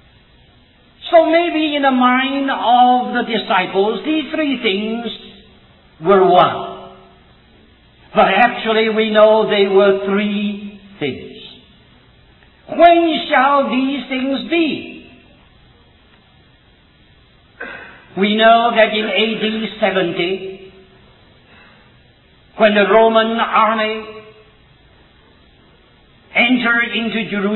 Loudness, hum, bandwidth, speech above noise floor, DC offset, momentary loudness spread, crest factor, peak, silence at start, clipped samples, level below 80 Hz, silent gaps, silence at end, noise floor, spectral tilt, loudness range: -14 LUFS; none; 4.2 kHz; 36 dB; under 0.1%; 19 LU; 16 dB; 0 dBFS; 1.05 s; under 0.1%; -52 dBFS; none; 0 s; -50 dBFS; -8 dB/octave; 6 LU